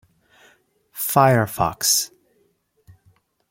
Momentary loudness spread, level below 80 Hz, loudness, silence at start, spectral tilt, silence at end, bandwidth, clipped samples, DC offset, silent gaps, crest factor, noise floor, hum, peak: 14 LU; -54 dBFS; -19 LUFS; 0.95 s; -3.5 dB/octave; 1.45 s; 16.5 kHz; under 0.1%; under 0.1%; none; 22 dB; -65 dBFS; none; -2 dBFS